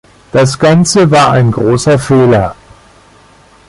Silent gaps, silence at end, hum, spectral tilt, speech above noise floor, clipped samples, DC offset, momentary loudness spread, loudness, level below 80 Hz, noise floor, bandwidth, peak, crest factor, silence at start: none; 1.15 s; none; -5.5 dB/octave; 34 dB; under 0.1%; under 0.1%; 5 LU; -9 LUFS; -38 dBFS; -42 dBFS; 11.5 kHz; 0 dBFS; 10 dB; 0.35 s